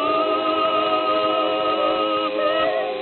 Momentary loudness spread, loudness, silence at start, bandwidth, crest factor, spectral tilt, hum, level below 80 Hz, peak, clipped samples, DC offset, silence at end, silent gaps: 1 LU; -20 LUFS; 0 s; 4.4 kHz; 12 dB; -0.5 dB/octave; none; -60 dBFS; -8 dBFS; under 0.1%; under 0.1%; 0 s; none